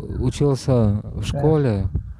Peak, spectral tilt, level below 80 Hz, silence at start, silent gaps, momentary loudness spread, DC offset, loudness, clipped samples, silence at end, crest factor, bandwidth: -4 dBFS; -7.5 dB/octave; -32 dBFS; 0 s; none; 7 LU; under 0.1%; -20 LUFS; under 0.1%; 0 s; 14 dB; 11.5 kHz